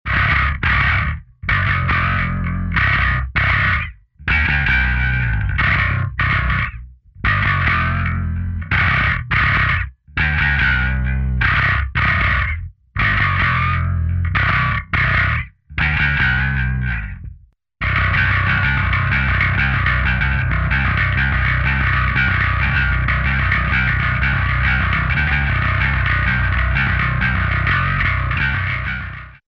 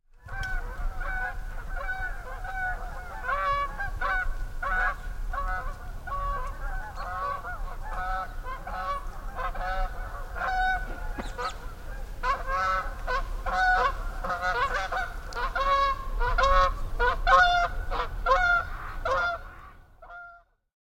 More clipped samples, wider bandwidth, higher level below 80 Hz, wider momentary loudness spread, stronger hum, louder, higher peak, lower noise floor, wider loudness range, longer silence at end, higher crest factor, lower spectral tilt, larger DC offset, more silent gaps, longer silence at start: neither; second, 6 kHz vs 16.5 kHz; first, -24 dBFS vs -34 dBFS; second, 6 LU vs 15 LU; neither; first, -17 LUFS vs -29 LUFS; about the same, -4 dBFS vs -6 dBFS; second, -44 dBFS vs -52 dBFS; second, 1 LU vs 10 LU; second, 0.15 s vs 0.5 s; second, 14 dB vs 22 dB; first, -7 dB/octave vs -4 dB/octave; neither; neither; second, 0.05 s vs 0.25 s